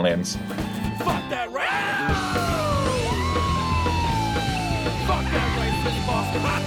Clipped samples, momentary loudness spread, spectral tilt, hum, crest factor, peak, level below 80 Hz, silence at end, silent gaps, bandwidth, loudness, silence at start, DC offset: under 0.1%; 4 LU; -5 dB/octave; none; 14 dB; -10 dBFS; -34 dBFS; 0 s; none; 19.5 kHz; -24 LUFS; 0 s; under 0.1%